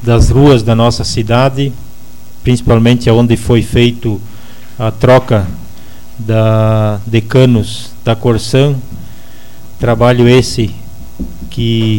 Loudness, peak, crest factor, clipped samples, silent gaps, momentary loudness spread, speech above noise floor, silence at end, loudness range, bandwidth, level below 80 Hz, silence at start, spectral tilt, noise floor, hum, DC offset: -11 LUFS; 0 dBFS; 12 dB; under 0.1%; none; 15 LU; 27 dB; 0 s; 2 LU; 17 kHz; -26 dBFS; 0 s; -6.5 dB/octave; -37 dBFS; none; 8%